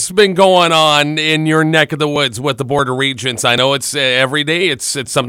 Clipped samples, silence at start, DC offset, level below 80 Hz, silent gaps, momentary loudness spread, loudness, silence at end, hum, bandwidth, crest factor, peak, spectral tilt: under 0.1%; 0 s; under 0.1%; -52 dBFS; none; 7 LU; -12 LUFS; 0 s; none; 16.5 kHz; 14 dB; 0 dBFS; -3.5 dB/octave